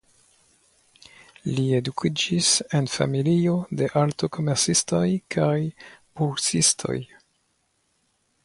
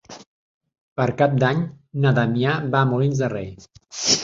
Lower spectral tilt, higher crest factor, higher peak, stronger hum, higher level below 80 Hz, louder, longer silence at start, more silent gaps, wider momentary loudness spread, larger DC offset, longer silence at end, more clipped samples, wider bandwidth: about the same, -4 dB/octave vs -4.5 dB/octave; about the same, 20 dB vs 18 dB; about the same, -6 dBFS vs -4 dBFS; neither; about the same, -58 dBFS vs -54 dBFS; about the same, -23 LUFS vs -21 LUFS; first, 1.45 s vs 0.1 s; second, none vs 0.27-0.61 s, 0.81-0.96 s; second, 10 LU vs 13 LU; neither; first, 1.4 s vs 0 s; neither; first, 11.5 kHz vs 7.8 kHz